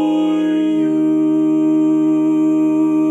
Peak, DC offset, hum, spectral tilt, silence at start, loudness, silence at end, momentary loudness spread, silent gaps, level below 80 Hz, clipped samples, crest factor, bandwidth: -6 dBFS; under 0.1%; none; -7.5 dB/octave; 0 s; -15 LUFS; 0 s; 2 LU; none; -70 dBFS; under 0.1%; 8 dB; 8 kHz